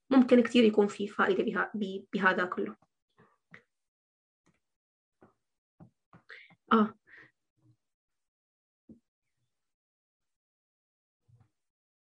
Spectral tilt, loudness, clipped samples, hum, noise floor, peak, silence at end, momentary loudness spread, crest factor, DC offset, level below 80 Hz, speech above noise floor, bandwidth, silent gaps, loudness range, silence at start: -6 dB/octave; -28 LUFS; under 0.1%; none; -86 dBFS; -10 dBFS; 3.3 s; 12 LU; 22 dB; under 0.1%; -78 dBFS; 59 dB; 9.4 kHz; 3.02-3.08 s, 3.88-4.44 s, 4.76-5.12 s, 5.58-5.78 s, 6.06-6.12 s, 7.50-7.56 s, 7.94-8.08 s, 8.28-8.88 s; 8 LU; 0.1 s